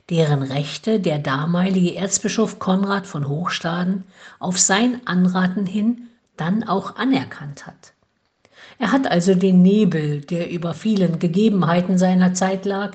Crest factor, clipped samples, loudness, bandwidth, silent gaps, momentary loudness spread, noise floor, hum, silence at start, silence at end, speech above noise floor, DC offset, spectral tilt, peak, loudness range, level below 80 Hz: 18 dB; under 0.1%; -19 LUFS; 9.2 kHz; none; 9 LU; -66 dBFS; none; 0.1 s; 0 s; 47 dB; under 0.1%; -5.5 dB/octave; -2 dBFS; 5 LU; -60 dBFS